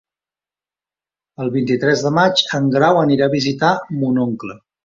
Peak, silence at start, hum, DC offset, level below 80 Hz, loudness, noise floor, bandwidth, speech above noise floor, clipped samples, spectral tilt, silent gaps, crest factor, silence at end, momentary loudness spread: -2 dBFS; 1.4 s; none; under 0.1%; -58 dBFS; -16 LUFS; under -90 dBFS; 7.6 kHz; over 74 dB; under 0.1%; -5.5 dB/octave; none; 16 dB; 0.3 s; 9 LU